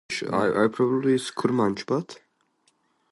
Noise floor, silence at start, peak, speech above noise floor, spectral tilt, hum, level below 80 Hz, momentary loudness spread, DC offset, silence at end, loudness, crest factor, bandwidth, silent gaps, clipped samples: -68 dBFS; 0.1 s; -8 dBFS; 44 dB; -6 dB/octave; none; -64 dBFS; 7 LU; under 0.1%; 0.95 s; -24 LUFS; 18 dB; 11.5 kHz; none; under 0.1%